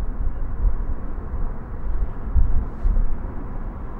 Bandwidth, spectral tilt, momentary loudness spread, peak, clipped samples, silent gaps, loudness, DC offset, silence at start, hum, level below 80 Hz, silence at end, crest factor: 2.3 kHz; -11 dB/octave; 9 LU; -4 dBFS; under 0.1%; none; -29 LUFS; under 0.1%; 0 s; none; -22 dBFS; 0 s; 16 dB